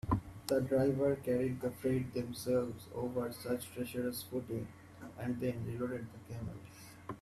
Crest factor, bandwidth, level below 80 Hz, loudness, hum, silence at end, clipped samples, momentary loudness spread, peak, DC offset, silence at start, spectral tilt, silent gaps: 18 dB; 14.5 kHz; -58 dBFS; -37 LUFS; none; 0 s; under 0.1%; 15 LU; -18 dBFS; under 0.1%; 0.05 s; -6.5 dB/octave; none